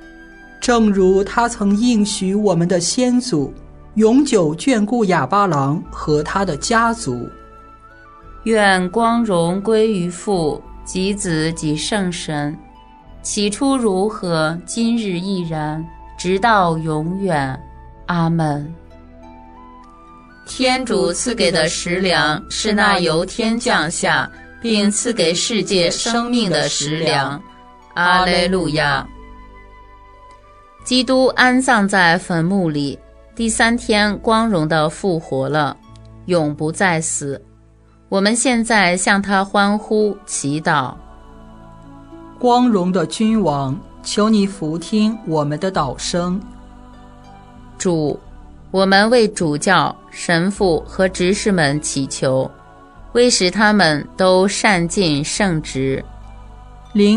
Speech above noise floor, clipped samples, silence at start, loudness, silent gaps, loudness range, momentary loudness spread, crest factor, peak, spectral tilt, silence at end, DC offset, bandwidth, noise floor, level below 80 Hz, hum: 32 dB; under 0.1%; 0 s; -17 LUFS; none; 5 LU; 10 LU; 18 dB; 0 dBFS; -4.5 dB/octave; 0 s; under 0.1%; 11 kHz; -48 dBFS; -42 dBFS; none